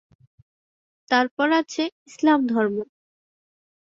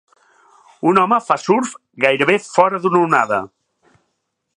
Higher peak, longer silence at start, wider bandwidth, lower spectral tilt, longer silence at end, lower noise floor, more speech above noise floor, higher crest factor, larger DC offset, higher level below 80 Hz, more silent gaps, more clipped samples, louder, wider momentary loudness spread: second, -4 dBFS vs 0 dBFS; first, 1.1 s vs 0.85 s; second, 7.8 kHz vs 11 kHz; about the same, -4.5 dB/octave vs -5 dB/octave; about the same, 1.15 s vs 1.1 s; first, under -90 dBFS vs -72 dBFS; first, over 69 dB vs 57 dB; about the same, 22 dB vs 18 dB; neither; second, -70 dBFS vs -64 dBFS; first, 1.31-1.37 s, 1.92-2.06 s vs none; neither; second, -22 LUFS vs -16 LUFS; first, 10 LU vs 7 LU